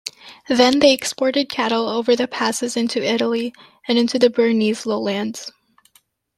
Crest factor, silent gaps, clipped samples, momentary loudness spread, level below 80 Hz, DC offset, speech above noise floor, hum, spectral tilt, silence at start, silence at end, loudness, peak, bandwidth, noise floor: 18 dB; none; under 0.1%; 12 LU; -64 dBFS; under 0.1%; 41 dB; none; -3.5 dB/octave; 0.05 s; 0.9 s; -18 LUFS; 0 dBFS; 14.5 kHz; -59 dBFS